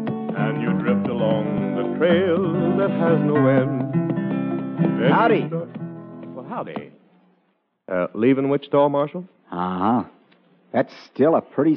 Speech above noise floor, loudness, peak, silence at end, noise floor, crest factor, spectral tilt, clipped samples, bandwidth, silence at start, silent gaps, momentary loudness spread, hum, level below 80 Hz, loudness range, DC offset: 48 dB; -21 LUFS; -6 dBFS; 0 s; -68 dBFS; 16 dB; -6.5 dB/octave; under 0.1%; 5.8 kHz; 0 s; none; 15 LU; none; -66 dBFS; 5 LU; under 0.1%